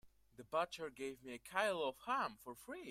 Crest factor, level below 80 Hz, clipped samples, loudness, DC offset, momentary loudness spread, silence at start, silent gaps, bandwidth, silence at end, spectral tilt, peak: 22 dB; -76 dBFS; under 0.1%; -42 LUFS; under 0.1%; 13 LU; 0.05 s; none; 16 kHz; 0 s; -3.5 dB/octave; -22 dBFS